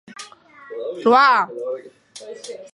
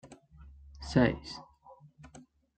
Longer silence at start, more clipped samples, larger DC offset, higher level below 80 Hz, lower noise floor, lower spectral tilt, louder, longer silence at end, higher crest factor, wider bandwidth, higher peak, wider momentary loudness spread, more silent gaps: about the same, 0.1 s vs 0.05 s; neither; neither; second, -78 dBFS vs -52 dBFS; second, -43 dBFS vs -58 dBFS; second, -3.5 dB/octave vs -6.5 dB/octave; first, -17 LUFS vs -30 LUFS; second, 0.05 s vs 0.4 s; second, 18 dB vs 26 dB; first, 11.5 kHz vs 9 kHz; first, -4 dBFS vs -10 dBFS; about the same, 25 LU vs 27 LU; neither